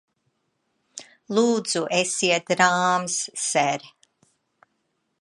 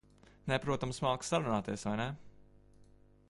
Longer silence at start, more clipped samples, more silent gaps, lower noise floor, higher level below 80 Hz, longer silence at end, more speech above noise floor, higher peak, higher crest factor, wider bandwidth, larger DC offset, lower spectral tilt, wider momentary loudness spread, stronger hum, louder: first, 0.95 s vs 0.45 s; neither; neither; first, -74 dBFS vs -62 dBFS; second, -78 dBFS vs -58 dBFS; first, 1.35 s vs 0.45 s; first, 51 dB vs 27 dB; first, -2 dBFS vs -16 dBFS; about the same, 22 dB vs 20 dB; about the same, 11.5 kHz vs 11.5 kHz; neither; second, -2.5 dB/octave vs -5 dB/octave; first, 21 LU vs 8 LU; second, none vs 50 Hz at -60 dBFS; first, -22 LUFS vs -36 LUFS